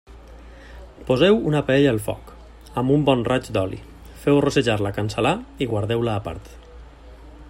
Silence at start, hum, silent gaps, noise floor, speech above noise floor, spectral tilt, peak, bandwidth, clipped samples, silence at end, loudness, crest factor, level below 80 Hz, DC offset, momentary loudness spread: 0.1 s; none; none; -43 dBFS; 22 dB; -6.5 dB/octave; -4 dBFS; 16 kHz; under 0.1%; 0 s; -21 LUFS; 18 dB; -44 dBFS; under 0.1%; 14 LU